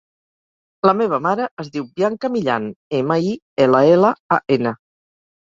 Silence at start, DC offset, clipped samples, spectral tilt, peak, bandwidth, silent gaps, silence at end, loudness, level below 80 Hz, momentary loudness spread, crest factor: 0.85 s; under 0.1%; under 0.1%; -7.5 dB/octave; 0 dBFS; 7.6 kHz; 1.51-1.57 s, 2.76-2.91 s, 3.42-3.56 s, 4.20-4.29 s; 0.7 s; -18 LUFS; -60 dBFS; 11 LU; 18 dB